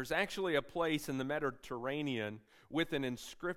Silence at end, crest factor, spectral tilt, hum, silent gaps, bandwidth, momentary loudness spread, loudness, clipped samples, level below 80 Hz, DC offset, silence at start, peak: 0 s; 18 dB; -5 dB/octave; none; none; 16 kHz; 7 LU; -37 LUFS; under 0.1%; -64 dBFS; under 0.1%; 0 s; -18 dBFS